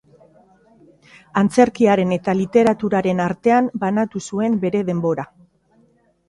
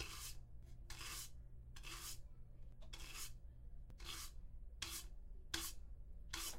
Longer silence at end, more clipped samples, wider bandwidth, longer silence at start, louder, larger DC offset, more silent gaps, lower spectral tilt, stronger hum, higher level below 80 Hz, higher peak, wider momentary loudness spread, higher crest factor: first, 1.05 s vs 0 s; neither; second, 11.5 kHz vs 16 kHz; first, 1.35 s vs 0 s; first, -18 LUFS vs -52 LUFS; neither; neither; first, -7 dB/octave vs -1.5 dB/octave; neither; about the same, -58 dBFS vs -56 dBFS; first, 0 dBFS vs -26 dBFS; second, 8 LU vs 14 LU; second, 18 dB vs 26 dB